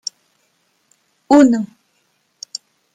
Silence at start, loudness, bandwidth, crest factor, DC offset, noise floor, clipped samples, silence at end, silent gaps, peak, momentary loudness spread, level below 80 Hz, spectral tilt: 1.3 s; -13 LUFS; 9.4 kHz; 18 dB; under 0.1%; -64 dBFS; under 0.1%; 1.3 s; none; -2 dBFS; 21 LU; -62 dBFS; -4.5 dB/octave